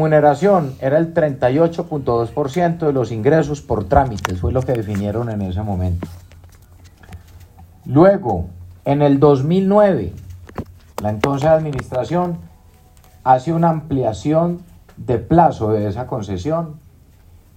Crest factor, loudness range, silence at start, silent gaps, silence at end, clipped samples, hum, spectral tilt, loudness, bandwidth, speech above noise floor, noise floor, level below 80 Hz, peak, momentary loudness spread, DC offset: 16 dB; 5 LU; 0 s; none; 0.8 s; under 0.1%; none; -8 dB/octave; -17 LUFS; 15.5 kHz; 31 dB; -47 dBFS; -38 dBFS; 0 dBFS; 14 LU; under 0.1%